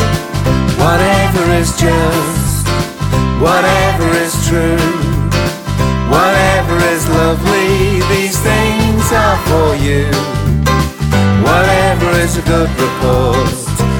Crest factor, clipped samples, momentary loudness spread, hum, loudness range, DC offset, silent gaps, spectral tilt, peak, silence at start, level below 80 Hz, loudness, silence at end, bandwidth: 12 dB; under 0.1%; 5 LU; none; 1 LU; under 0.1%; none; -5 dB/octave; 0 dBFS; 0 s; -22 dBFS; -12 LUFS; 0 s; 19 kHz